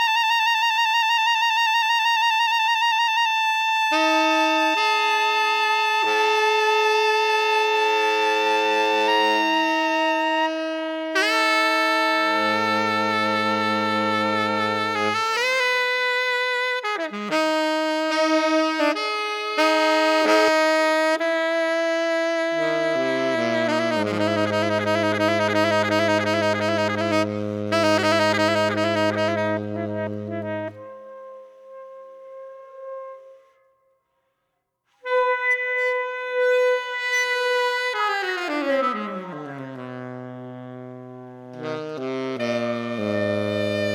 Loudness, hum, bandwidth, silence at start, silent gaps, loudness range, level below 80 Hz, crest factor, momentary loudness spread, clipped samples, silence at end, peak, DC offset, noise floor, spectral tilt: -21 LUFS; none; 19 kHz; 0 s; none; 10 LU; -76 dBFS; 16 dB; 13 LU; under 0.1%; 0 s; -6 dBFS; under 0.1%; -76 dBFS; -3.5 dB/octave